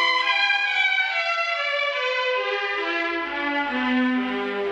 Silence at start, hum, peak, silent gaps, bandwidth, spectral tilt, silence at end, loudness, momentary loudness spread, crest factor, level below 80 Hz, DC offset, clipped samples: 0 s; none; -8 dBFS; none; 8.6 kHz; -2.5 dB/octave; 0 s; -22 LUFS; 6 LU; 16 dB; -64 dBFS; under 0.1%; under 0.1%